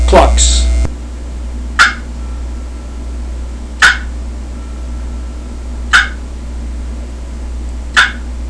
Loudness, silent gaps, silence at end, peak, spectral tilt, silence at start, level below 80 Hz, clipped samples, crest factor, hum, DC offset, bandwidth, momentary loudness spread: -14 LUFS; none; 0 s; 0 dBFS; -3 dB/octave; 0 s; -18 dBFS; 0.4%; 14 dB; none; under 0.1%; 11 kHz; 17 LU